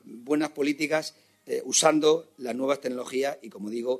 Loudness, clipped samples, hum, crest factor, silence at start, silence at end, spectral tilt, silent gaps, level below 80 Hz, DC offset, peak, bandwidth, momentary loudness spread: -26 LUFS; under 0.1%; none; 22 dB; 0.05 s; 0 s; -2.5 dB/octave; none; -80 dBFS; under 0.1%; -4 dBFS; 13.5 kHz; 14 LU